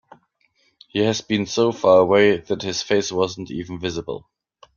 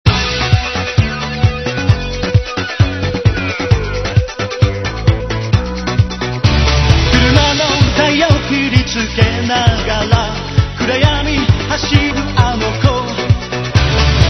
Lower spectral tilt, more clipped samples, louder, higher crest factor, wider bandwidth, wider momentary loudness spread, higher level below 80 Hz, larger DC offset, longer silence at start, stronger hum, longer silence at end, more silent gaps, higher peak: about the same, -4.5 dB/octave vs -5.5 dB/octave; second, under 0.1% vs 0.3%; second, -20 LUFS vs -14 LUFS; first, 18 dB vs 12 dB; first, 7.2 kHz vs 6.4 kHz; first, 15 LU vs 5 LU; second, -56 dBFS vs -22 dBFS; second, under 0.1% vs 0.2%; first, 0.95 s vs 0.05 s; neither; first, 0.55 s vs 0 s; neither; about the same, -2 dBFS vs 0 dBFS